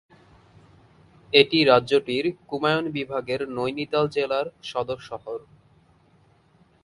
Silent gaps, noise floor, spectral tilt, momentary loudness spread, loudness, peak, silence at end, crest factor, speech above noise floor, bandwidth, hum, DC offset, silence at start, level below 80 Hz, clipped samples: none; -60 dBFS; -5.5 dB/octave; 15 LU; -23 LUFS; 0 dBFS; 1.45 s; 24 dB; 36 dB; 11.5 kHz; none; under 0.1%; 1.3 s; -62 dBFS; under 0.1%